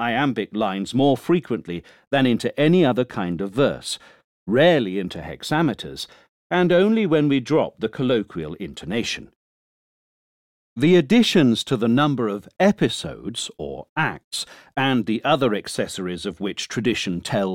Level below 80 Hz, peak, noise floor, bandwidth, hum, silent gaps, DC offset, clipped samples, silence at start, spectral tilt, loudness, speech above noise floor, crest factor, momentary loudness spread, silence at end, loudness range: -54 dBFS; -6 dBFS; under -90 dBFS; 16.5 kHz; none; 2.07-2.11 s, 4.24-4.46 s, 6.29-6.50 s, 9.35-10.76 s, 13.89-13.96 s, 14.24-14.31 s; under 0.1%; under 0.1%; 0 s; -5.5 dB/octave; -21 LUFS; over 69 dB; 16 dB; 14 LU; 0 s; 4 LU